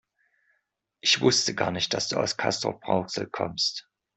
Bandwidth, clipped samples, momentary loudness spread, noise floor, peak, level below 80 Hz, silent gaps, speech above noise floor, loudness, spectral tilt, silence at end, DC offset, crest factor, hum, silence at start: 8.4 kHz; under 0.1%; 9 LU; -77 dBFS; -6 dBFS; -64 dBFS; none; 50 dB; -25 LUFS; -3 dB/octave; 0.35 s; under 0.1%; 22 dB; none; 1.05 s